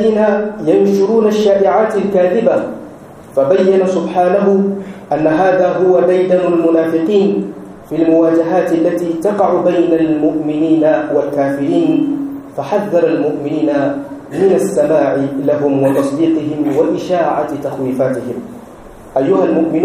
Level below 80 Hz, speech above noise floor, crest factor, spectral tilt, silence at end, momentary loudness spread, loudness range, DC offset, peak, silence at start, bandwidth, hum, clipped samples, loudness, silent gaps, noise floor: -52 dBFS; 22 dB; 12 dB; -7.5 dB/octave; 0 s; 9 LU; 3 LU; under 0.1%; 0 dBFS; 0 s; 14 kHz; none; under 0.1%; -13 LUFS; none; -34 dBFS